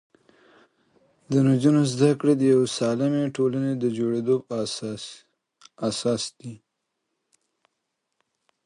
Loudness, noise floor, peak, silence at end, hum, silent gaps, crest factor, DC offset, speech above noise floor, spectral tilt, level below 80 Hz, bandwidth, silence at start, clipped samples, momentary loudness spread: -23 LUFS; -79 dBFS; -6 dBFS; 2.1 s; none; none; 20 dB; under 0.1%; 57 dB; -6.5 dB/octave; -68 dBFS; 11 kHz; 1.3 s; under 0.1%; 14 LU